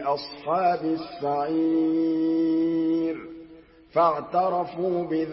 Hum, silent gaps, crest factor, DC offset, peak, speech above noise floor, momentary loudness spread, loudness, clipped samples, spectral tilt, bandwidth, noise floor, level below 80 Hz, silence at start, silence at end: none; none; 16 dB; under 0.1%; -10 dBFS; 25 dB; 7 LU; -25 LUFS; under 0.1%; -10.5 dB/octave; 5.8 kHz; -49 dBFS; -64 dBFS; 0 s; 0 s